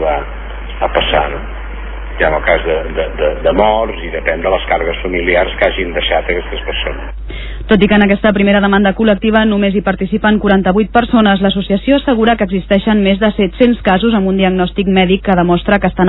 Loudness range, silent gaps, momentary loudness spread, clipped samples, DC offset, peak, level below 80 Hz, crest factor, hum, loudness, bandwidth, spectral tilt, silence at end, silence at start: 4 LU; none; 10 LU; under 0.1%; under 0.1%; 0 dBFS; -26 dBFS; 12 dB; none; -12 LUFS; 4.1 kHz; -10 dB/octave; 0 s; 0 s